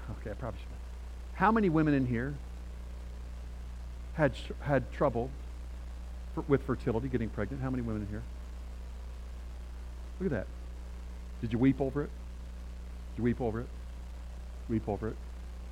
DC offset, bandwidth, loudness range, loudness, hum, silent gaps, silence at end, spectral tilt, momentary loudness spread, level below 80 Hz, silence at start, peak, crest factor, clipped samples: under 0.1%; 12 kHz; 7 LU; -34 LUFS; 60 Hz at -40 dBFS; none; 0 s; -8 dB/octave; 17 LU; -42 dBFS; 0 s; -12 dBFS; 22 dB; under 0.1%